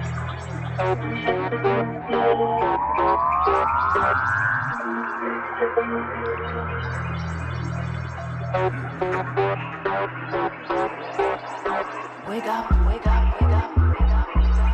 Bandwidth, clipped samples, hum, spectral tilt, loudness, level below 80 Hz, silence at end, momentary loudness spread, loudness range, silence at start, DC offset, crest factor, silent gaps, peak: 8.4 kHz; under 0.1%; none; -7.5 dB/octave; -23 LUFS; -28 dBFS; 0 s; 9 LU; 6 LU; 0 s; under 0.1%; 16 dB; none; -6 dBFS